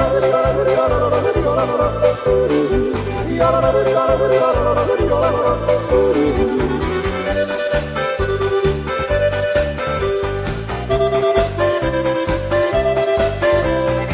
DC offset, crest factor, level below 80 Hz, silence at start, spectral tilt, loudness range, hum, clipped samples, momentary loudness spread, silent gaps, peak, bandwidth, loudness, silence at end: under 0.1%; 14 dB; -30 dBFS; 0 s; -10.5 dB/octave; 3 LU; none; under 0.1%; 5 LU; none; -2 dBFS; 4 kHz; -17 LUFS; 0 s